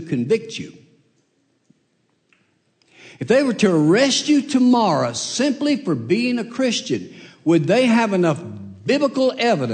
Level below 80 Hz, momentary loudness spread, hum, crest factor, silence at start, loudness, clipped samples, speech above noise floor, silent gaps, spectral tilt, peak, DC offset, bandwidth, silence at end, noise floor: -68 dBFS; 12 LU; none; 16 dB; 0 s; -18 LUFS; under 0.1%; 48 dB; none; -5 dB/octave; -4 dBFS; under 0.1%; 9.4 kHz; 0 s; -66 dBFS